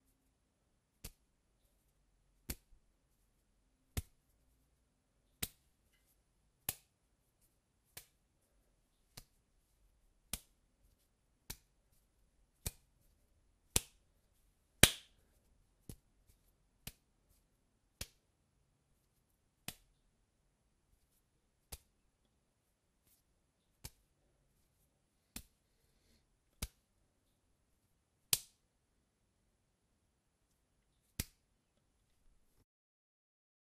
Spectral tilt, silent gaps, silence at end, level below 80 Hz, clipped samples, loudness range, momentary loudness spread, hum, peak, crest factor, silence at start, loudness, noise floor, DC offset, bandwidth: -2 dB/octave; none; 2.4 s; -62 dBFS; under 0.1%; 24 LU; 22 LU; none; -2 dBFS; 46 dB; 1.05 s; -39 LUFS; -81 dBFS; under 0.1%; 15.5 kHz